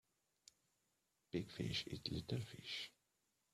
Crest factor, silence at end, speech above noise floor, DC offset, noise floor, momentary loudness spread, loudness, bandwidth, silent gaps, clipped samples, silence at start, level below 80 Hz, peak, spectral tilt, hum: 24 dB; 0.65 s; 39 dB; under 0.1%; -86 dBFS; 5 LU; -47 LUFS; 14.5 kHz; none; under 0.1%; 1.35 s; -70 dBFS; -26 dBFS; -5 dB/octave; none